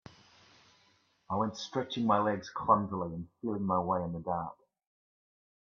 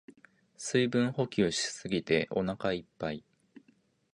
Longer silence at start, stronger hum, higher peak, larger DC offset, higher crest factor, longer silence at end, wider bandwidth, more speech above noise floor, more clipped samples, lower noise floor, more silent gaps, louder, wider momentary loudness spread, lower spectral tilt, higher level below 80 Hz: first, 1.3 s vs 0.1 s; neither; about the same, -12 dBFS vs -12 dBFS; neither; about the same, 24 dB vs 20 dB; first, 1.1 s vs 0.95 s; second, 7.4 kHz vs 11 kHz; about the same, 37 dB vs 37 dB; neither; about the same, -69 dBFS vs -68 dBFS; neither; about the same, -33 LUFS vs -31 LUFS; about the same, 9 LU vs 10 LU; first, -6.5 dB/octave vs -4.5 dB/octave; second, -68 dBFS vs -62 dBFS